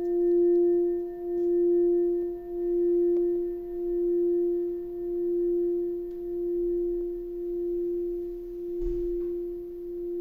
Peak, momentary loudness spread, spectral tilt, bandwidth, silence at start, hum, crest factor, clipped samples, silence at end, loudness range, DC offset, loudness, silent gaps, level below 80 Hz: -18 dBFS; 11 LU; -10.5 dB/octave; 1.9 kHz; 0 s; none; 10 dB; under 0.1%; 0 s; 6 LU; under 0.1%; -28 LUFS; none; -48 dBFS